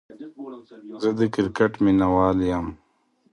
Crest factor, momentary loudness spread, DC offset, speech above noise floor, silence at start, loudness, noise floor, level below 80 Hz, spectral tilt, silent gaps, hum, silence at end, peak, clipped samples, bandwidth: 18 dB; 21 LU; under 0.1%; 43 dB; 0.1 s; -22 LUFS; -65 dBFS; -46 dBFS; -8 dB/octave; none; none; 0.55 s; -6 dBFS; under 0.1%; 9.8 kHz